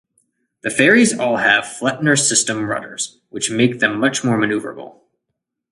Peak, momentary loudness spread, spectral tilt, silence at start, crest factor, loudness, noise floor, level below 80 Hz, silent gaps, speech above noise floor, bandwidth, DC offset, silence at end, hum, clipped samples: 0 dBFS; 13 LU; -3 dB/octave; 0.65 s; 18 dB; -16 LUFS; -78 dBFS; -60 dBFS; none; 60 dB; 11.5 kHz; under 0.1%; 0.8 s; none; under 0.1%